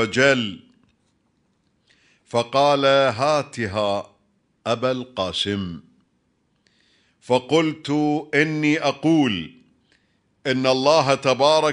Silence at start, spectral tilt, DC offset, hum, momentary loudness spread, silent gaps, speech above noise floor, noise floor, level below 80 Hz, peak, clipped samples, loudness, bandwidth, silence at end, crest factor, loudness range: 0 s; -5 dB/octave; under 0.1%; none; 12 LU; none; 47 dB; -67 dBFS; -62 dBFS; -2 dBFS; under 0.1%; -20 LUFS; 10.5 kHz; 0 s; 20 dB; 6 LU